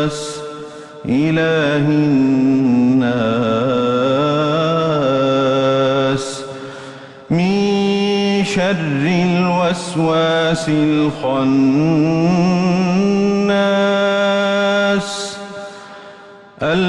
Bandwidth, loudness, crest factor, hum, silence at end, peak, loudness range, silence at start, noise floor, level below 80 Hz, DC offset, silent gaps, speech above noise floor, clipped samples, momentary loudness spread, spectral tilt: 11.5 kHz; -15 LUFS; 10 dB; none; 0 s; -4 dBFS; 2 LU; 0 s; -39 dBFS; -50 dBFS; under 0.1%; none; 25 dB; under 0.1%; 15 LU; -6 dB/octave